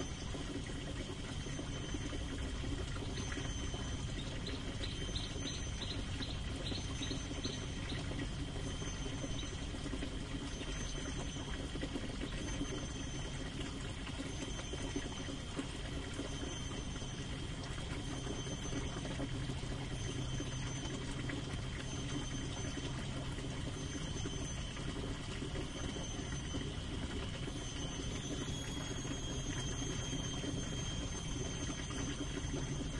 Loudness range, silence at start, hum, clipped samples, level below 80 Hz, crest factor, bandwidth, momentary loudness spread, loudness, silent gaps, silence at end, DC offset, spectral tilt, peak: 2 LU; 0 s; none; under 0.1%; -46 dBFS; 16 dB; 11.5 kHz; 3 LU; -42 LUFS; none; 0 s; under 0.1%; -4 dB/octave; -26 dBFS